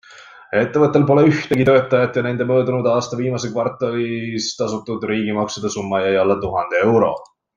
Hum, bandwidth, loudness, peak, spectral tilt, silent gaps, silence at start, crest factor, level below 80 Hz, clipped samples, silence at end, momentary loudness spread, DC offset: none; 10.5 kHz; -18 LUFS; -2 dBFS; -6 dB/octave; none; 0.1 s; 16 dB; -54 dBFS; under 0.1%; 0.35 s; 9 LU; under 0.1%